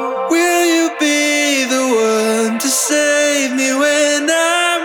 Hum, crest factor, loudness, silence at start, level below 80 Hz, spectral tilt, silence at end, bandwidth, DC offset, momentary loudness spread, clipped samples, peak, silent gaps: none; 12 dB; -13 LUFS; 0 s; -78 dBFS; -1 dB/octave; 0 s; over 20 kHz; under 0.1%; 2 LU; under 0.1%; -2 dBFS; none